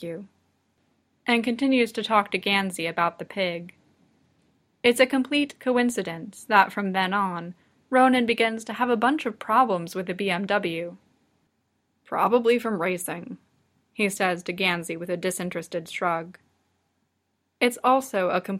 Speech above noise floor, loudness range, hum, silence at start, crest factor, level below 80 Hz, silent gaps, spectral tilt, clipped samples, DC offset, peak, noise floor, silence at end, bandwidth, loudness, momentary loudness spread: 51 dB; 5 LU; none; 0 s; 24 dB; -70 dBFS; none; -4.5 dB/octave; under 0.1%; under 0.1%; -2 dBFS; -75 dBFS; 0 s; 16 kHz; -24 LUFS; 13 LU